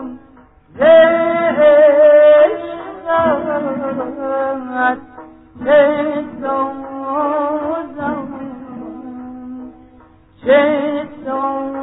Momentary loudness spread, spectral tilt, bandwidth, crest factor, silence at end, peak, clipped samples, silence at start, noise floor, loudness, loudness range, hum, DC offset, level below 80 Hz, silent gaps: 22 LU; -9.5 dB/octave; 4 kHz; 14 dB; 0 s; 0 dBFS; under 0.1%; 0 s; -46 dBFS; -14 LUFS; 11 LU; none; under 0.1%; -54 dBFS; none